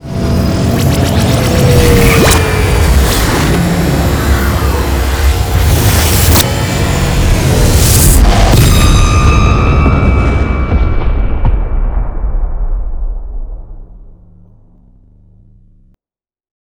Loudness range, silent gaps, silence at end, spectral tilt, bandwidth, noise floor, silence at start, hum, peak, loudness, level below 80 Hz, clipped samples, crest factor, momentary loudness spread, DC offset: 13 LU; none; 2.5 s; -5 dB/octave; over 20 kHz; under -90 dBFS; 0.05 s; none; 0 dBFS; -10 LUFS; -14 dBFS; 0.6%; 10 dB; 12 LU; under 0.1%